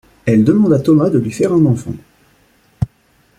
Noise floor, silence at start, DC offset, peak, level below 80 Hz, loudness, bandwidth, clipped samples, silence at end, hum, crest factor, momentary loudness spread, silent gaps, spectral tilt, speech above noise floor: -55 dBFS; 0.25 s; under 0.1%; -2 dBFS; -44 dBFS; -14 LUFS; 12.5 kHz; under 0.1%; 0.55 s; none; 14 dB; 13 LU; none; -8.5 dB/octave; 42 dB